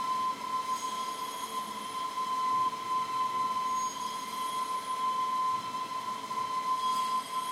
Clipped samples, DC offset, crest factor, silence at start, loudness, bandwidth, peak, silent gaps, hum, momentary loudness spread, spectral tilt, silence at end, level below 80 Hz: under 0.1%; under 0.1%; 12 dB; 0 s; -33 LUFS; 16 kHz; -22 dBFS; none; none; 6 LU; -1.5 dB/octave; 0 s; -78 dBFS